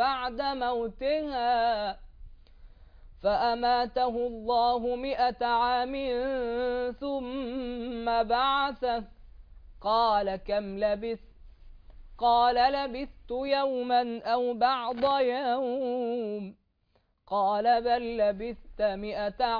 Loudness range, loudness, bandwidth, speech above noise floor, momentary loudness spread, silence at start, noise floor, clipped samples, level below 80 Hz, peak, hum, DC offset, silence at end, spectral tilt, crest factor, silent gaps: 3 LU; -28 LUFS; 5.2 kHz; 43 dB; 9 LU; 0 s; -71 dBFS; under 0.1%; -50 dBFS; -12 dBFS; none; under 0.1%; 0 s; -6.5 dB/octave; 16 dB; none